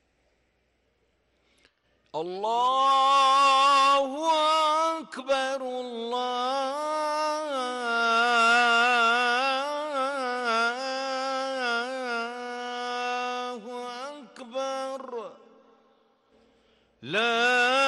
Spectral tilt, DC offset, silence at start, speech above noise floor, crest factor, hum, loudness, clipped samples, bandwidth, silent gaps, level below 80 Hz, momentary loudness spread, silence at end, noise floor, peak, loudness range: -1.5 dB/octave; under 0.1%; 2.15 s; 47 dB; 12 dB; none; -25 LUFS; under 0.1%; 12 kHz; none; -76 dBFS; 16 LU; 0 s; -71 dBFS; -14 dBFS; 12 LU